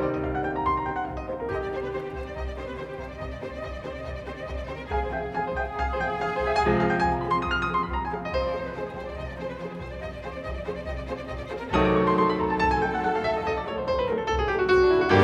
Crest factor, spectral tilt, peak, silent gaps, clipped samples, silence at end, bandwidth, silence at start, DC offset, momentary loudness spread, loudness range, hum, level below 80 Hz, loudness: 20 dB; -7 dB/octave; -6 dBFS; none; under 0.1%; 0 s; 9.6 kHz; 0 s; under 0.1%; 13 LU; 9 LU; none; -38 dBFS; -27 LUFS